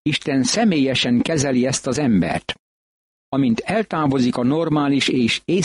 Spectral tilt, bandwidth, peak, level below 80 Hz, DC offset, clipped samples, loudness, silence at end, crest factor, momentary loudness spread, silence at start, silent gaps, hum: -4.5 dB/octave; 11.5 kHz; -8 dBFS; -50 dBFS; under 0.1%; under 0.1%; -19 LUFS; 0 s; 12 dB; 5 LU; 0.05 s; 2.59-3.32 s; none